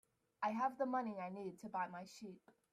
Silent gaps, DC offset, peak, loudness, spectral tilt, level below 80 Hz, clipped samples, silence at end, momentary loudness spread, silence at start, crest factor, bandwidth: none; under 0.1%; -28 dBFS; -43 LUFS; -6 dB/octave; -88 dBFS; under 0.1%; 0.35 s; 15 LU; 0.4 s; 18 dB; 15 kHz